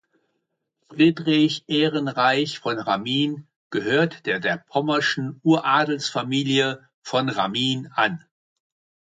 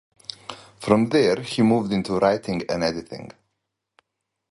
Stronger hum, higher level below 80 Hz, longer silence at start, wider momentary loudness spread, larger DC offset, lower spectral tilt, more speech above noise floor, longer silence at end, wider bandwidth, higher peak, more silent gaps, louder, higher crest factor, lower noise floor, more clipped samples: neither; second, -68 dBFS vs -56 dBFS; first, 0.9 s vs 0.5 s; second, 7 LU vs 19 LU; neither; about the same, -5 dB/octave vs -6 dB/octave; second, 55 dB vs 59 dB; second, 0.95 s vs 1.25 s; second, 9.2 kHz vs 11.5 kHz; second, -6 dBFS vs -2 dBFS; first, 3.56-3.70 s, 6.94-7.02 s vs none; about the same, -22 LUFS vs -21 LUFS; about the same, 18 dB vs 22 dB; second, -76 dBFS vs -80 dBFS; neither